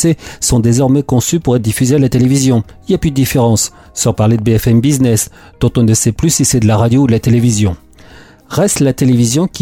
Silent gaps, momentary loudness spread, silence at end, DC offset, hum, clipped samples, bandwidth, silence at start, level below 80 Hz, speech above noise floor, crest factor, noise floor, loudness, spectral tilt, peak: none; 5 LU; 0 s; under 0.1%; none; under 0.1%; 17 kHz; 0 s; -32 dBFS; 27 dB; 10 dB; -38 dBFS; -12 LUFS; -5.5 dB/octave; -2 dBFS